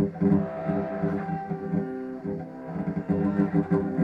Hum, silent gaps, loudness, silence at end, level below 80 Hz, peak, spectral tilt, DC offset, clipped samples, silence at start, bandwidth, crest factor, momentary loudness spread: none; none; -28 LUFS; 0 s; -54 dBFS; -12 dBFS; -11 dB/octave; under 0.1%; under 0.1%; 0 s; 4.9 kHz; 16 dB; 10 LU